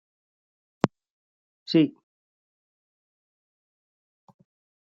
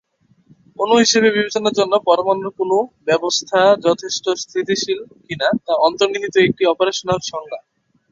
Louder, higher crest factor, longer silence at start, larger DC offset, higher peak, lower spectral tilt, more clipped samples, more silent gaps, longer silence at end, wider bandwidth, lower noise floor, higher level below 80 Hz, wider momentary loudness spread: second, -26 LUFS vs -17 LUFS; first, 30 dB vs 16 dB; about the same, 0.85 s vs 0.8 s; neither; about the same, -2 dBFS vs -2 dBFS; first, -5.5 dB/octave vs -3 dB/octave; neither; first, 1.10-1.66 s vs none; first, 2.9 s vs 0.5 s; about the same, 7.4 kHz vs 7.8 kHz; first, under -90 dBFS vs -54 dBFS; second, -80 dBFS vs -58 dBFS; about the same, 8 LU vs 10 LU